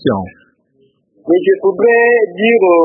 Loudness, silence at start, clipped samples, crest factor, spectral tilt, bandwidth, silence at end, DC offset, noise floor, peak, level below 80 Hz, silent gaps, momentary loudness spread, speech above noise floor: -12 LUFS; 0.05 s; under 0.1%; 12 dB; -11.5 dB/octave; 4.5 kHz; 0 s; under 0.1%; -56 dBFS; 0 dBFS; -54 dBFS; none; 14 LU; 45 dB